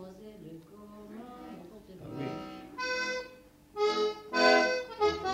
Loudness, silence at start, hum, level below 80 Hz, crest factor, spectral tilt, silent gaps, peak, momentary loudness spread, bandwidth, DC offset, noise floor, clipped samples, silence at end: -30 LUFS; 0 s; none; -62 dBFS; 22 dB; -3.5 dB/octave; none; -12 dBFS; 24 LU; 16 kHz; under 0.1%; -54 dBFS; under 0.1%; 0 s